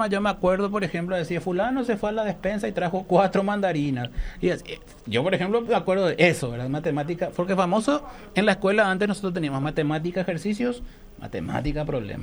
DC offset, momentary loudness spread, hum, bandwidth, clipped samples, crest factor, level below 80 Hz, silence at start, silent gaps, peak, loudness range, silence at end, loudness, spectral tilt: under 0.1%; 8 LU; none; over 20 kHz; under 0.1%; 18 dB; -42 dBFS; 0 s; none; -6 dBFS; 2 LU; 0 s; -25 LUFS; -6 dB/octave